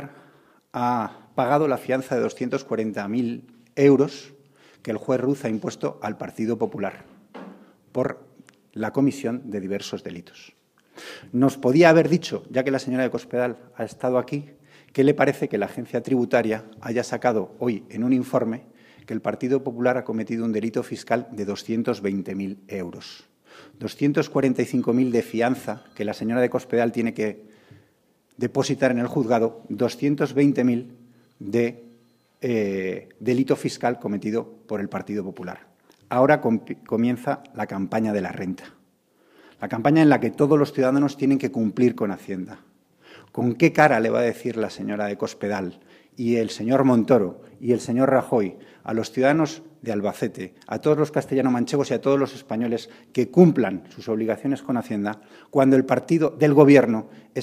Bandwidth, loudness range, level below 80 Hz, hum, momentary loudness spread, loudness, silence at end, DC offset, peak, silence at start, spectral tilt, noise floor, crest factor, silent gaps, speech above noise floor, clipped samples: 15 kHz; 6 LU; -68 dBFS; none; 14 LU; -23 LUFS; 0 s; under 0.1%; 0 dBFS; 0 s; -7 dB/octave; -63 dBFS; 22 dB; none; 41 dB; under 0.1%